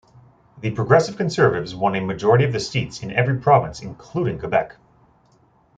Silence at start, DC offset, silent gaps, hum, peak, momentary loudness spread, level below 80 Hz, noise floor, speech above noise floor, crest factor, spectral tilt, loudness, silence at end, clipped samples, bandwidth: 0.55 s; under 0.1%; none; none; -2 dBFS; 12 LU; -52 dBFS; -57 dBFS; 38 dB; 18 dB; -6.5 dB/octave; -20 LUFS; 1.1 s; under 0.1%; 9 kHz